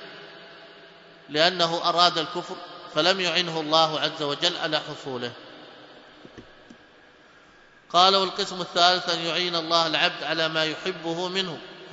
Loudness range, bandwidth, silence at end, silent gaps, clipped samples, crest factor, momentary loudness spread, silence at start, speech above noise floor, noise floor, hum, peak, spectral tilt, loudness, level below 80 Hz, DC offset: 8 LU; 8 kHz; 0 s; none; under 0.1%; 24 dB; 16 LU; 0 s; 29 dB; -54 dBFS; none; -2 dBFS; -3 dB/octave; -23 LUFS; -70 dBFS; under 0.1%